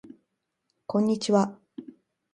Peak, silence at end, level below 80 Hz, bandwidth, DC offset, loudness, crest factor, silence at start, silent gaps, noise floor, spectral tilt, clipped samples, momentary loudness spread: -10 dBFS; 0.5 s; -72 dBFS; 11 kHz; under 0.1%; -26 LUFS; 20 dB; 0.9 s; none; -79 dBFS; -6 dB/octave; under 0.1%; 22 LU